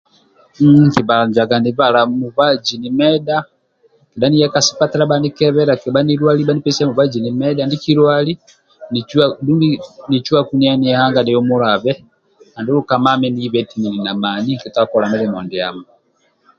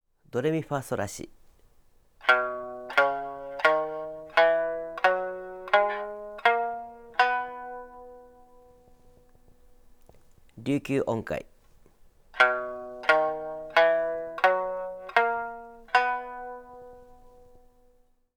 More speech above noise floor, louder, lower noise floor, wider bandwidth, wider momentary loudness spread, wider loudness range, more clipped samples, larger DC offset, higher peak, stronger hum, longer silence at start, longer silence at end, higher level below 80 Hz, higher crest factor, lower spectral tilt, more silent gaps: first, 45 dB vs 34 dB; first, -15 LUFS vs -27 LUFS; second, -59 dBFS vs -63 dBFS; second, 7.4 kHz vs 18.5 kHz; second, 8 LU vs 17 LU; second, 3 LU vs 9 LU; neither; neither; first, 0 dBFS vs -4 dBFS; neither; first, 0.6 s vs 0.35 s; second, 0.75 s vs 1.2 s; first, -54 dBFS vs -60 dBFS; second, 14 dB vs 24 dB; about the same, -5.5 dB/octave vs -4.5 dB/octave; neither